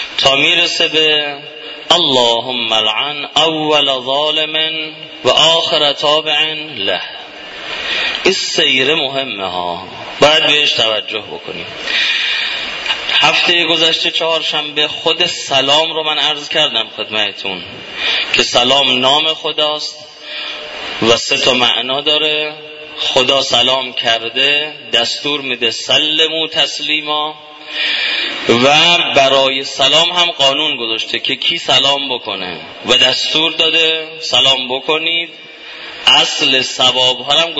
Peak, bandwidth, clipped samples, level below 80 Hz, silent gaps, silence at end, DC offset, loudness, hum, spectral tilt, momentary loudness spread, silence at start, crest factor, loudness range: 0 dBFS; 11 kHz; under 0.1%; -52 dBFS; none; 0 s; under 0.1%; -12 LUFS; none; -2 dB/octave; 13 LU; 0 s; 14 dB; 3 LU